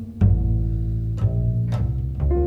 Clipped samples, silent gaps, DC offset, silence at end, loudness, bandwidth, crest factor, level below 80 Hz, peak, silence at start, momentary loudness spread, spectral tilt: under 0.1%; none; under 0.1%; 0 s; -23 LUFS; 4 kHz; 14 dB; -26 dBFS; -6 dBFS; 0 s; 5 LU; -10.5 dB/octave